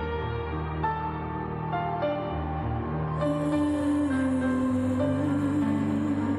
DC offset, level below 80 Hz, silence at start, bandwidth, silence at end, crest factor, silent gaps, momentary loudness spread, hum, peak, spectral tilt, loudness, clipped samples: under 0.1%; -42 dBFS; 0 s; 11 kHz; 0 s; 12 dB; none; 6 LU; none; -16 dBFS; -8 dB/octave; -28 LUFS; under 0.1%